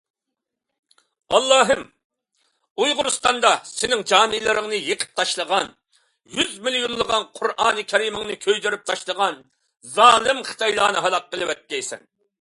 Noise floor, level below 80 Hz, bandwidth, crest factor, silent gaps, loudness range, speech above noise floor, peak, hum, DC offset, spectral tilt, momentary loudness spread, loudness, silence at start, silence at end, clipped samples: -83 dBFS; -58 dBFS; 11.5 kHz; 22 dB; 2.04-2.10 s, 2.71-2.75 s; 3 LU; 62 dB; 0 dBFS; none; under 0.1%; -1 dB/octave; 11 LU; -20 LUFS; 1.3 s; 0.45 s; under 0.1%